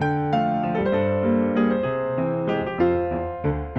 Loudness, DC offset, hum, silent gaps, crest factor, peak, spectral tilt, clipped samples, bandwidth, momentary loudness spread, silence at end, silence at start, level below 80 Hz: -23 LUFS; under 0.1%; none; none; 14 dB; -8 dBFS; -9.5 dB/octave; under 0.1%; 6 kHz; 5 LU; 0 s; 0 s; -42 dBFS